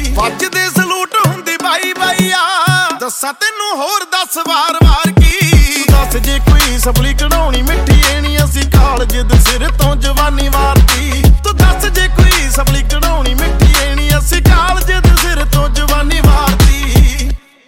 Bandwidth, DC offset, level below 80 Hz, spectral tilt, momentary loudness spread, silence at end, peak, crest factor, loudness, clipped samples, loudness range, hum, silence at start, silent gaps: 17.5 kHz; under 0.1%; -12 dBFS; -4 dB/octave; 5 LU; 0.3 s; 0 dBFS; 10 dB; -11 LUFS; under 0.1%; 2 LU; none; 0 s; none